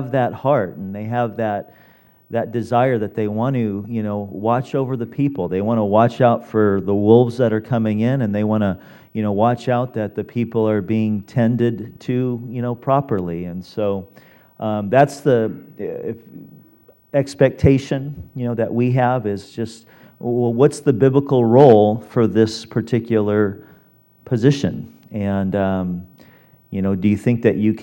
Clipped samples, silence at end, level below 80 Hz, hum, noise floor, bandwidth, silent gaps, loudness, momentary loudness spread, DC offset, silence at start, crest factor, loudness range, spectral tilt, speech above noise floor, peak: under 0.1%; 0 s; -50 dBFS; none; -53 dBFS; 16.5 kHz; none; -19 LUFS; 12 LU; under 0.1%; 0 s; 18 dB; 6 LU; -8 dB/octave; 35 dB; 0 dBFS